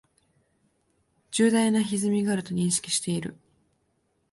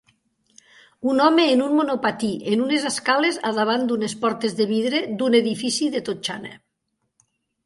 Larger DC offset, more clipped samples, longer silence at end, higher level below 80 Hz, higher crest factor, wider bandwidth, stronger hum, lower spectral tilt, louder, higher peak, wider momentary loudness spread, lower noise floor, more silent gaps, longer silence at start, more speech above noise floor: neither; neither; about the same, 1 s vs 1.1 s; about the same, -66 dBFS vs -68 dBFS; about the same, 18 dB vs 18 dB; about the same, 11.5 kHz vs 11.5 kHz; neither; about the same, -4.5 dB/octave vs -4 dB/octave; second, -25 LUFS vs -21 LUFS; second, -10 dBFS vs -4 dBFS; about the same, 10 LU vs 9 LU; about the same, -72 dBFS vs -75 dBFS; neither; first, 1.3 s vs 1 s; second, 47 dB vs 55 dB